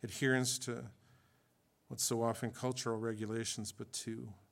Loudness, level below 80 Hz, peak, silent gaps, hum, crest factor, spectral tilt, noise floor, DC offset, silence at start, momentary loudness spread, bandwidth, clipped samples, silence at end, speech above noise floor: -38 LUFS; -80 dBFS; -18 dBFS; none; none; 20 dB; -3.5 dB/octave; -74 dBFS; under 0.1%; 0.05 s; 13 LU; 17 kHz; under 0.1%; 0.15 s; 36 dB